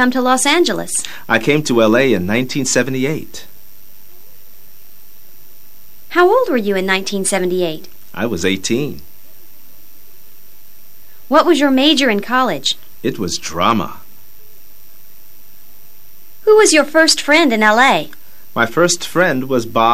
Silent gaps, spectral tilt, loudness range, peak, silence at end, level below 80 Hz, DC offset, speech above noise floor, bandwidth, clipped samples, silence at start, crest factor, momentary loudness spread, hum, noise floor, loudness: none; -3.5 dB/octave; 10 LU; 0 dBFS; 0 s; -54 dBFS; 4%; 31 dB; 16 kHz; under 0.1%; 0 s; 16 dB; 12 LU; none; -45 dBFS; -14 LUFS